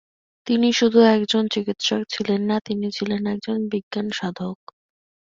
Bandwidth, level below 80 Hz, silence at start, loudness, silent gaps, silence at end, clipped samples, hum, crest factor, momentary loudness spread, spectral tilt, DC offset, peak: 7.6 kHz; -64 dBFS; 0.45 s; -21 LUFS; 3.83-3.91 s; 0.75 s; under 0.1%; none; 20 dB; 12 LU; -5 dB/octave; under 0.1%; -2 dBFS